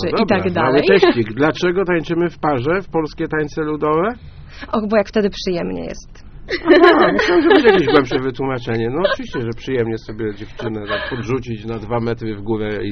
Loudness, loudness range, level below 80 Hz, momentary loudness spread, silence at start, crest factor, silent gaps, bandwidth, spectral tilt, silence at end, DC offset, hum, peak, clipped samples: -17 LUFS; 8 LU; -40 dBFS; 15 LU; 0 s; 16 dB; none; 6.6 kHz; -4.5 dB/octave; 0 s; under 0.1%; none; 0 dBFS; under 0.1%